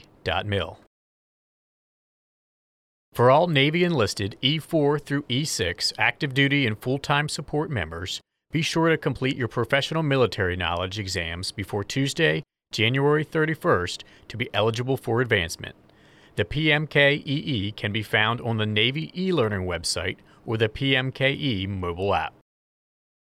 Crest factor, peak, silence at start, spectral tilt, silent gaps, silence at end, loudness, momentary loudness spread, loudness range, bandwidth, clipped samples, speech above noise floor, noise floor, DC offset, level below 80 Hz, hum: 18 dB; -6 dBFS; 0.25 s; -5 dB/octave; 0.87-3.12 s; 0.9 s; -24 LUFS; 10 LU; 3 LU; 15.5 kHz; under 0.1%; 30 dB; -54 dBFS; under 0.1%; -54 dBFS; none